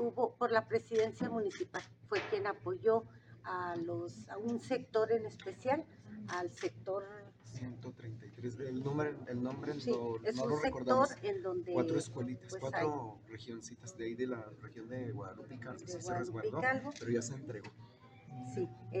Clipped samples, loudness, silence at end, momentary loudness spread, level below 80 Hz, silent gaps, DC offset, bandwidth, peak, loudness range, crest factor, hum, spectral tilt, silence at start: under 0.1%; -38 LUFS; 0 s; 15 LU; -70 dBFS; none; under 0.1%; 9.8 kHz; -16 dBFS; 6 LU; 22 dB; none; -6 dB/octave; 0 s